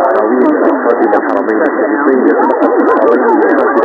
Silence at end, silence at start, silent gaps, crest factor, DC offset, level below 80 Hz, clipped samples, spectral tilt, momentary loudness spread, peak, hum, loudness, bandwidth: 0 s; 0 s; none; 10 dB; under 0.1%; -58 dBFS; 0.5%; -7.5 dB/octave; 3 LU; 0 dBFS; none; -10 LUFS; 5.6 kHz